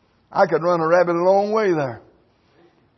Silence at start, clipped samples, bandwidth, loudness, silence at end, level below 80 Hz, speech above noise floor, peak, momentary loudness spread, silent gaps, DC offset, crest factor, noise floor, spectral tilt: 0.35 s; under 0.1%; 6.2 kHz; -19 LUFS; 1 s; -66 dBFS; 40 dB; -4 dBFS; 8 LU; none; under 0.1%; 16 dB; -57 dBFS; -7 dB/octave